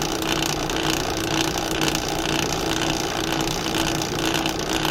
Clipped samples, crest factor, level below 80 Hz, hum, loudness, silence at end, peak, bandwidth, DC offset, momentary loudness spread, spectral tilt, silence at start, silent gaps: under 0.1%; 20 dB; -38 dBFS; none; -23 LUFS; 0 s; -4 dBFS; 16.5 kHz; under 0.1%; 1 LU; -3 dB/octave; 0 s; none